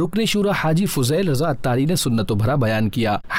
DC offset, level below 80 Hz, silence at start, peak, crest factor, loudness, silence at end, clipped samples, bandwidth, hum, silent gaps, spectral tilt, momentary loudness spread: under 0.1%; -42 dBFS; 0 s; -12 dBFS; 8 dB; -20 LUFS; 0 s; under 0.1%; 16 kHz; none; none; -5.5 dB/octave; 2 LU